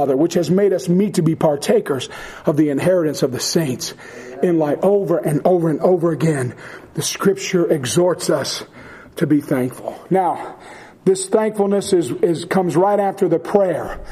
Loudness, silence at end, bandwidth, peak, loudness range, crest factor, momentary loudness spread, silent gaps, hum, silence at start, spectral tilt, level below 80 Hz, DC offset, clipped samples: -18 LUFS; 0 s; 15.5 kHz; 0 dBFS; 2 LU; 18 dB; 10 LU; none; none; 0 s; -5.5 dB/octave; -50 dBFS; under 0.1%; under 0.1%